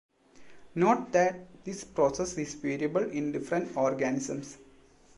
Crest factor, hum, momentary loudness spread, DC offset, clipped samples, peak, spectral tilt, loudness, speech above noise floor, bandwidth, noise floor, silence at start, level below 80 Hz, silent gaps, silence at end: 18 dB; none; 14 LU; under 0.1%; under 0.1%; -12 dBFS; -5.5 dB/octave; -30 LUFS; 29 dB; 11.5 kHz; -58 dBFS; 0.4 s; -62 dBFS; none; 0.55 s